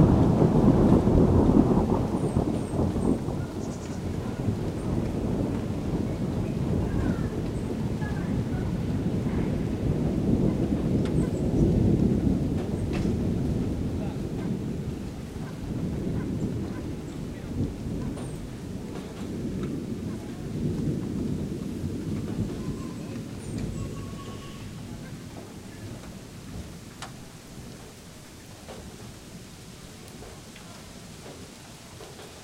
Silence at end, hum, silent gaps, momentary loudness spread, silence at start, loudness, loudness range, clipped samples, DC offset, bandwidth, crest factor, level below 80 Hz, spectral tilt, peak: 0 s; none; none; 20 LU; 0 s; -28 LUFS; 17 LU; under 0.1%; under 0.1%; 16 kHz; 22 dB; -38 dBFS; -8 dB/octave; -6 dBFS